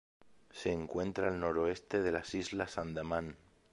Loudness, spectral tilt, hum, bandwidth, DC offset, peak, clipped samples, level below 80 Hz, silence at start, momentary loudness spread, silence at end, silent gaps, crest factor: -37 LUFS; -5.5 dB/octave; none; 11 kHz; under 0.1%; -18 dBFS; under 0.1%; -58 dBFS; 0.25 s; 6 LU; 0.35 s; none; 20 dB